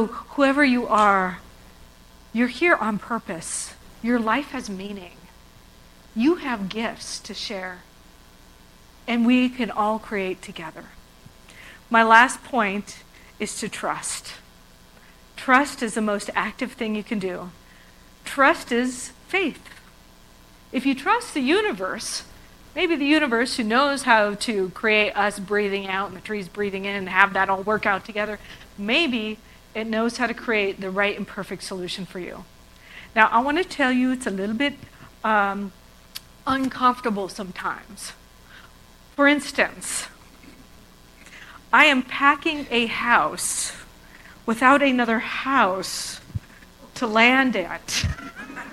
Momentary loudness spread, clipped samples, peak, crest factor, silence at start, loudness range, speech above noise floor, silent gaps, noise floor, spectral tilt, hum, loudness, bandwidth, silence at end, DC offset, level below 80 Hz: 18 LU; under 0.1%; 0 dBFS; 24 dB; 0 s; 6 LU; 28 dB; none; -50 dBFS; -3.5 dB/octave; none; -22 LUFS; 16 kHz; 0 s; under 0.1%; -52 dBFS